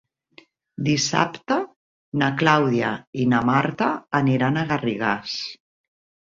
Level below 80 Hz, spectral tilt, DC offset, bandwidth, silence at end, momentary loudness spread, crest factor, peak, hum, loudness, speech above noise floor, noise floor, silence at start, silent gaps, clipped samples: -60 dBFS; -5 dB/octave; under 0.1%; 7.8 kHz; 0.8 s; 11 LU; 20 dB; -2 dBFS; none; -22 LUFS; 32 dB; -54 dBFS; 0.8 s; 1.76-2.12 s, 3.07-3.13 s; under 0.1%